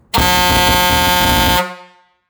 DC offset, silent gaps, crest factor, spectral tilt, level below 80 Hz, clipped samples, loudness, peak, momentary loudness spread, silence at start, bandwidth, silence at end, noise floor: under 0.1%; none; 14 dB; -3 dB/octave; -26 dBFS; under 0.1%; -11 LUFS; 0 dBFS; 4 LU; 0.15 s; over 20 kHz; 0.45 s; -44 dBFS